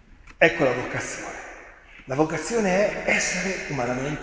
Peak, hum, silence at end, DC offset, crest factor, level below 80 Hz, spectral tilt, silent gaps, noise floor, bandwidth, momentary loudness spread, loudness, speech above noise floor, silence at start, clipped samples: -2 dBFS; none; 0 s; under 0.1%; 22 dB; -50 dBFS; -4 dB/octave; none; -46 dBFS; 8 kHz; 14 LU; -24 LUFS; 22 dB; 0.1 s; under 0.1%